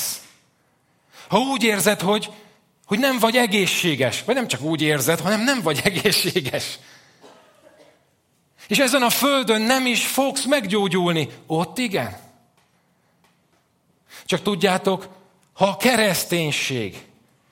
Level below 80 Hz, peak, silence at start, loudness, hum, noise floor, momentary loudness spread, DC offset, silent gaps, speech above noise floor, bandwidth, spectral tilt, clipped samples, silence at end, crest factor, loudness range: -62 dBFS; -2 dBFS; 0 s; -20 LUFS; none; -64 dBFS; 9 LU; under 0.1%; none; 44 dB; 16.5 kHz; -3.5 dB/octave; under 0.1%; 0.5 s; 20 dB; 7 LU